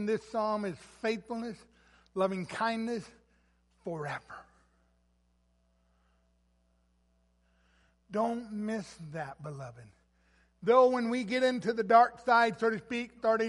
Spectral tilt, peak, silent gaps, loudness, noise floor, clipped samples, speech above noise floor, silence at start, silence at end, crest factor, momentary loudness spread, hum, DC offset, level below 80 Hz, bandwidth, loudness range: -5.5 dB/octave; -10 dBFS; none; -31 LUFS; -71 dBFS; under 0.1%; 41 dB; 0 s; 0 s; 22 dB; 19 LU; 60 Hz at -65 dBFS; under 0.1%; -70 dBFS; 11.5 kHz; 19 LU